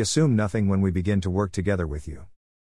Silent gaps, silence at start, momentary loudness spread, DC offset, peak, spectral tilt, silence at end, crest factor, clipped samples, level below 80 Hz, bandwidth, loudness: none; 0 s; 14 LU; 0.3%; -10 dBFS; -6 dB/octave; 0.5 s; 14 dB; under 0.1%; -44 dBFS; 12 kHz; -24 LUFS